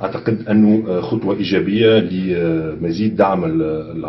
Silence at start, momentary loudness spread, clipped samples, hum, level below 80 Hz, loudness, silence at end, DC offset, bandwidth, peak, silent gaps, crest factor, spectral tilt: 0 s; 7 LU; under 0.1%; none; -46 dBFS; -17 LUFS; 0 s; under 0.1%; 6 kHz; -2 dBFS; none; 14 dB; -8.5 dB/octave